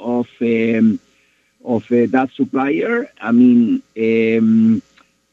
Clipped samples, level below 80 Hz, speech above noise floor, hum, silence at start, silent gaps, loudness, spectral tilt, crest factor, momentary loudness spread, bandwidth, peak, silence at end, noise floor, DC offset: under 0.1%; -64 dBFS; 44 dB; none; 0 s; none; -16 LUFS; -8.5 dB/octave; 14 dB; 9 LU; 4.2 kHz; -2 dBFS; 0.55 s; -58 dBFS; under 0.1%